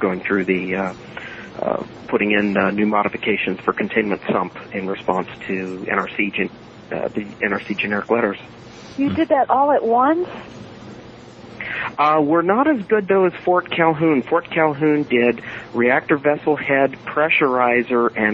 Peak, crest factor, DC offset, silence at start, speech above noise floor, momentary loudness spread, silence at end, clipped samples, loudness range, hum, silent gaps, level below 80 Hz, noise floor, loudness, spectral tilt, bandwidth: -2 dBFS; 18 dB; under 0.1%; 0 s; 21 dB; 13 LU; 0 s; under 0.1%; 5 LU; none; none; -56 dBFS; -39 dBFS; -19 LUFS; -7.5 dB/octave; 7.8 kHz